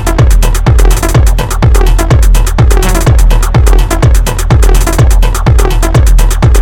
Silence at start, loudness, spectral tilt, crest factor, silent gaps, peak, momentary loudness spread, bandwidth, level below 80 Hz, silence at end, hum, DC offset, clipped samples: 0 s; -8 LUFS; -5.5 dB/octave; 6 dB; none; 0 dBFS; 2 LU; 16.5 kHz; -6 dBFS; 0 s; none; 2%; 1%